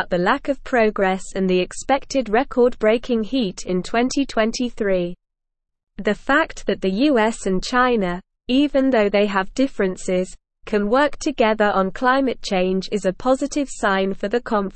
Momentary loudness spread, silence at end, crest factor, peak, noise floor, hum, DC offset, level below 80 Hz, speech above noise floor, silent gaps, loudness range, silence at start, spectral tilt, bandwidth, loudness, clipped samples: 6 LU; 0 s; 16 dB; -4 dBFS; -79 dBFS; none; 0.3%; -40 dBFS; 59 dB; none; 3 LU; 0 s; -5 dB/octave; 8.8 kHz; -20 LUFS; under 0.1%